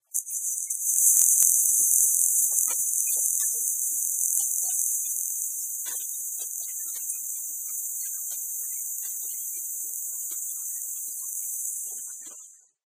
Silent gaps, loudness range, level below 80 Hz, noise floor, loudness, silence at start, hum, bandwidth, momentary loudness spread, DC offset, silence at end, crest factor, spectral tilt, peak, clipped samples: none; 10 LU; -88 dBFS; -49 dBFS; -24 LUFS; 0.15 s; none; 16 kHz; 12 LU; under 0.1%; 0.35 s; 28 dB; 4 dB/octave; 0 dBFS; under 0.1%